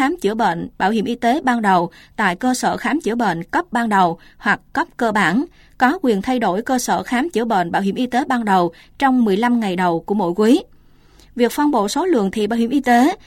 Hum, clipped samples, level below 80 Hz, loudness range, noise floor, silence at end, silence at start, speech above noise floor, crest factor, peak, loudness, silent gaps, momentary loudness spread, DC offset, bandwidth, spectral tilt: none; under 0.1%; -50 dBFS; 1 LU; -48 dBFS; 0.1 s; 0 s; 30 dB; 16 dB; -2 dBFS; -18 LUFS; none; 5 LU; under 0.1%; 16.5 kHz; -5 dB/octave